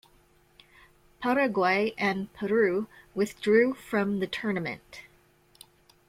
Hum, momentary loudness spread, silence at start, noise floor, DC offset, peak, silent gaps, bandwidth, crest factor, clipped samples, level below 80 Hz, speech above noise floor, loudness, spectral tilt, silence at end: none; 13 LU; 1.2 s; -62 dBFS; under 0.1%; -10 dBFS; none; 16 kHz; 18 dB; under 0.1%; -64 dBFS; 35 dB; -27 LUFS; -6 dB/octave; 1.1 s